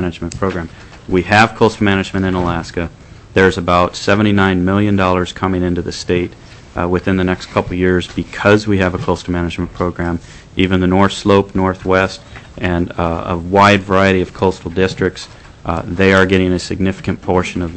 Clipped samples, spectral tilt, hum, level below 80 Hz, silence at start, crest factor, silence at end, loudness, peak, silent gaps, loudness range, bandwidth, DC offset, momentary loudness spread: under 0.1%; -6 dB/octave; none; -36 dBFS; 0 s; 14 dB; 0 s; -15 LUFS; 0 dBFS; none; 2 LU; 8.6 kHz; under 0.1%; 11 LU